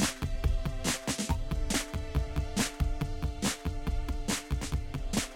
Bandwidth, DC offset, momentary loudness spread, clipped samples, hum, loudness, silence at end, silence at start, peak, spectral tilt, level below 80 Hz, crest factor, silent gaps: 17 kHz; under 0.1%; 4 LU; under 0.1%; none; -33 LUFS; 0 s; 0 s; -14 dBFS; -4 dB/octave; -34 dBFS; 16 dB; none